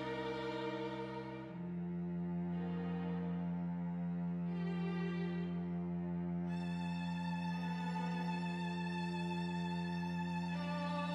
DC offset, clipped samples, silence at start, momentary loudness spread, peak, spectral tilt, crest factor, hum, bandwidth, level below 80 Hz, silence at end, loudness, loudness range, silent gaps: under 0.1%; under 0.1%; 0 s; 2 LU; -28 dBFS; -7.5 dB/octave; 12 dB; none; 8.4 kHz; -68 dBFS; 0 s; -41 LUFS; 2 LU; none